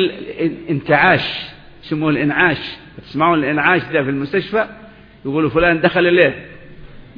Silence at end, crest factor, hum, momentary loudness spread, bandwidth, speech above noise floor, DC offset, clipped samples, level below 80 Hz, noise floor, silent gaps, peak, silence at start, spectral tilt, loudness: 0.15 s; 18 dB; none; 14 LU; 5.2 kHz; 21 dB; under 0.1%; under 0.1%; -44 dBFS; -37 dBFS; none; 0 dBFS; 0 s; -8.5 dB/octave; -16 LUFS